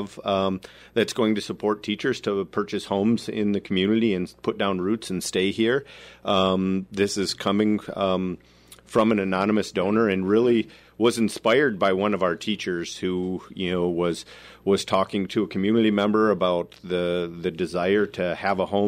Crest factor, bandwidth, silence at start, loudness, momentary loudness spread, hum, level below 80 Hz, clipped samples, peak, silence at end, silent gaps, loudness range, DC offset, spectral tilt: 16 dB; 15 kHz; 0 s; -24 LUFS; 8 LU; none; -60 dBFS; under 0.1%; -8 dBFS; 0 s; none; 3 LU; under 0.1%; -5.5 dB/octave